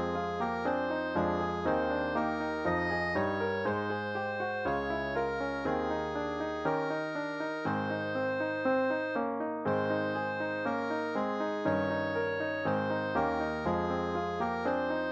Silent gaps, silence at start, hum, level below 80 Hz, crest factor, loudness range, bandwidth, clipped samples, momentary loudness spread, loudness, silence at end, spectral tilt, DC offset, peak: none; 0 s; none; -56 dBFS; 16 dB; 2 LU; 8 kHz; under 0.1%; 3 LU; -32 LUFS; 0 s; -7 dB/octave; under 0.1%; -16 dBFS